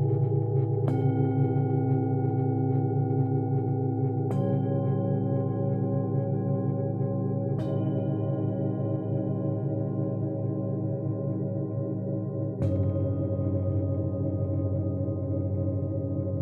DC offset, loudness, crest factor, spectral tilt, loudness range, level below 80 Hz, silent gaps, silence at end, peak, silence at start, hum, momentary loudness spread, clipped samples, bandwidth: under 0.1%; -28 LUFS; 14 dB; -12.5 dB/octave; 4 LU; -46 dBFS; none; 0 s; -14 dBFS; 0 s; none; 4 LU; under 0.1%; 3.3 kHz